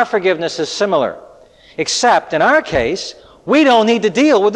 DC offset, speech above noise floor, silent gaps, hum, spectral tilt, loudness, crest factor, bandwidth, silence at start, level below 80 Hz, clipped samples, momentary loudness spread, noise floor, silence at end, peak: under 0.1%; 30 dB; none; none; -3.5 dB/octave; -14 LUFS; 12 dB; 11 kHz; 0 s; -46 dBFS; under 0.1%; 13 LU; -44 dBFS; 0 s; -2 dBFS